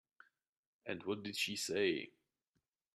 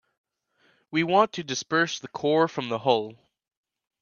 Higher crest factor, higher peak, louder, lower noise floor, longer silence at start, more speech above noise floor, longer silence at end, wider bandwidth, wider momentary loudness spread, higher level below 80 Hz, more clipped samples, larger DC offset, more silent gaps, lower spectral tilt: about the same, 22 dB vs 22 dB; second, -22 dBFS vs -6 dBFS; second, -39 LUFS vs -25 LUFS; first, -87 dBFS vs -67 dBFS; about the same, 0.85 s vs 0.9 s; first, 48 dB vs 42 dB; about the same, 0.85 s vs 0.9 s; first, 14 kHz vs 7.2 kHz; first, 14 LU vs 8 LU; second, -84 dBFS vs -74 dBFS; neither; neither; neither; about the same, -3 dB/octave vs -4 dB/octave